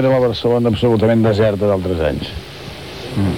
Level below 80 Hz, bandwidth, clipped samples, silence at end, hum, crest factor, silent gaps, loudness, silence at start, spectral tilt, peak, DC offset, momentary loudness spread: -36 dBFS; 16 kHz; under 0.1%; 0 s; none; 12 dB; none; -16 LUFS; 0 s; -7.5 dB/octave; -2 dBFS; 0.4%; 16 LU